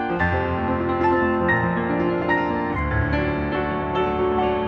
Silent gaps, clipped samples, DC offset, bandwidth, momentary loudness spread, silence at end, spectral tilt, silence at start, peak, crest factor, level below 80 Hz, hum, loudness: none; under 0.1%; under 0.1%; 6 kHz; 4 LU; 0 s; -9 dB/octave; 0 s; -8 dBFS; 14 dB; -36 dBFS; none; -22 LUFS